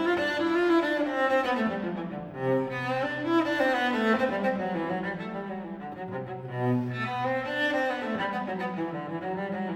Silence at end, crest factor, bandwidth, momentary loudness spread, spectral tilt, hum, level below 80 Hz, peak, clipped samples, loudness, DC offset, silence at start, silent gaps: 0 s; 16 dB; 15.5 kHz; 11 LU; -6.5 dB/octave; none; -64 dBFS; -14 dBFS; under 0.1%; -28 LUFS; under 0.1%; 0 s; none